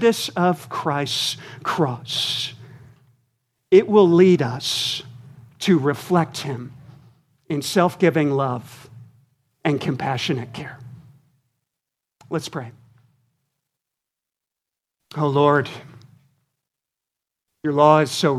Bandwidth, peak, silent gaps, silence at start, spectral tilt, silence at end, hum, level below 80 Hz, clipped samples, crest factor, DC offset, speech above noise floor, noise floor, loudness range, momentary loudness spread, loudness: 15 kHz; -2 dBFS; none; 0 s; -5.5 dB/octave; 0 s; none; -66 dBFS; under 0.1%; 20 dB; under 0.1%; 67 dB; -86 dBFS; 17 LU; 17 LU; -20 LUFS